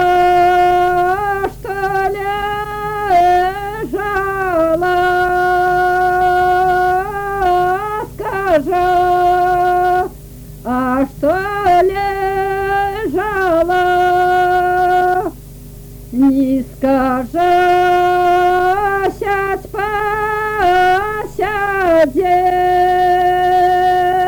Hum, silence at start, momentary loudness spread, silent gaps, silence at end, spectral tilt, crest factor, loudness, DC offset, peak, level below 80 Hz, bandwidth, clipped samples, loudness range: 50 Hz at -35 dBFS; 0 s; 8 LU; none; 0 s; -5.5 dB/octave; 8 dB; -14 LUFS; under 0.1%; -6 dBFS; -36 dBFS; over 20 kHz; under 0.1%; 2 LU